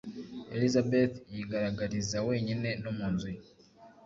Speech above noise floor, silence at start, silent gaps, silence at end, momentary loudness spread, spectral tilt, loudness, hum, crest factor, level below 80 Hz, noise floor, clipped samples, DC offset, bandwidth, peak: 26 dB; 0.05 s; none; 0.15 s; 14 LU; -6 dB/octave; -32 LUFS; none; 18 dB; -58 dBFS; -57 dBFS; under 0.1%; under 0.1%; 7.8 kHz; -14 dBFS